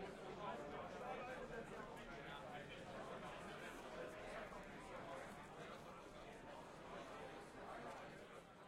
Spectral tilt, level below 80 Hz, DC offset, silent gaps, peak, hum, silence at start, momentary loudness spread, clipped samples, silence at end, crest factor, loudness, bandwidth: -4.5 dB/octave; -70 dBFS; under 0.1%; none; -38 dBFS; none; 0 s; 6 LU; under 0.1%; 0 s; 16 dB; -54 LUFS; 16 kHz